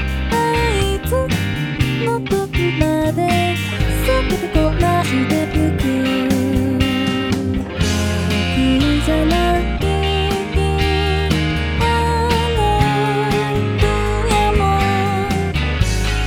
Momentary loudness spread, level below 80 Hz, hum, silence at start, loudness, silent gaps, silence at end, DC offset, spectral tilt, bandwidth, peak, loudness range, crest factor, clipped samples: 4 LU; -24 dBFS; none; 0 s; -17 LUFS; none; 0 s; under 0.1%; -5.5 dB/octave; 18.5 kHz; 0 dBFS; 1 LU; 16 dB; under 0.1%